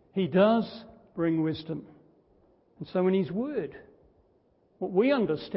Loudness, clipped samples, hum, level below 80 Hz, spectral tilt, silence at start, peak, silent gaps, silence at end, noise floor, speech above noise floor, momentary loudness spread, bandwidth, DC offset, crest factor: -28 LUFS; under 0.1%; none; -66 dBFS; -11 dB/octave; 0.15 s; -10 dBFS; none; 0 s; -66 dBFS; 39 dB; 17 LU; 5.8 kHz; under 0.1%; 20 dB